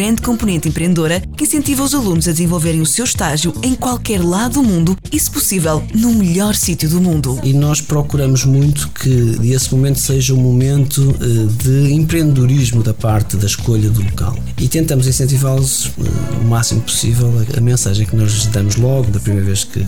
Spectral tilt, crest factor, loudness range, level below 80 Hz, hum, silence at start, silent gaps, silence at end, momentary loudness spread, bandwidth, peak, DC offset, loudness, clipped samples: -5 dB/octave; 10 dB; 2 LU; -30 dBFS; none; 0 s; none; 0 s; 4 LU; 19.5 kHz; -4 dBFS; 4%; -14 LUFS; under 0.1%